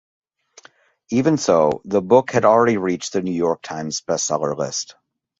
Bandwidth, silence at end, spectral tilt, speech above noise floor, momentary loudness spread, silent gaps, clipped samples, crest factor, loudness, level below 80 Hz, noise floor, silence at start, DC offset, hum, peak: 8.2 kHz; 0.5 s; -4.5 dB/octave; 32 dB; 11 LU; none; under 0.1%; 18 dB; -19 LUFS; -58 dBFS; -50 dBFS; 1.1 s; under 0.1%; none; -2 dBFS